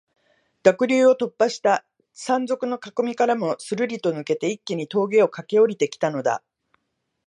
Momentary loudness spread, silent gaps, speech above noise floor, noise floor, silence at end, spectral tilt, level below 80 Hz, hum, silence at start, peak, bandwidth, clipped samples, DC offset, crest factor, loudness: 8 LU; none; 55 dB; -76 dBFS; 0.9 s; -5 dB/octave; -76 dBFS; none; 0.65 s; -2 dBFS; 11 kHz; under 0.1%; under 0.1%; 20 dB; -22 LUFS